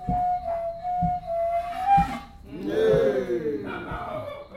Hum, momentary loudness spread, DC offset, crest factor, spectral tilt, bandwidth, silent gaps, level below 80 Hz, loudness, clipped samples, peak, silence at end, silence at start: none; 12 LU; under 0.1%; 14 dB; -7.5 dB/octave; 15 kHz; none; -44 dBFS; -26 LUFS; under 0.1%; -10 dBFS; 0 s; 0 s